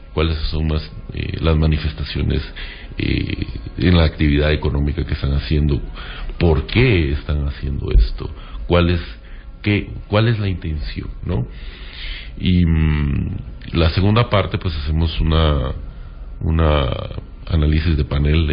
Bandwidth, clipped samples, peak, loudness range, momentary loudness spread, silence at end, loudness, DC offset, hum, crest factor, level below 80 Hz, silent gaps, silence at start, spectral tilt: 5.2 kHz; under 0.1%; -2 dBFS; 3 LU; 15 LU; 0 s; -19 LUFS; under 0.1%; none; 16 dB; -22 dBFS; none; 0 s; -12 dB/octave